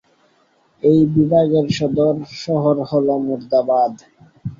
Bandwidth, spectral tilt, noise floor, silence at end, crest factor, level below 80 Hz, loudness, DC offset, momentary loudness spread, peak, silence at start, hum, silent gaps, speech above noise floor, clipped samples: 7.4 kHz; -8 dB/octave; -58 dBFS; 0.05 s; 16 dB; -54 dBFS; -17 LUFS; under 0.1%; 7 LU; -2 dBFS; 0.85 s; none; none; 42 dB; under 0.1%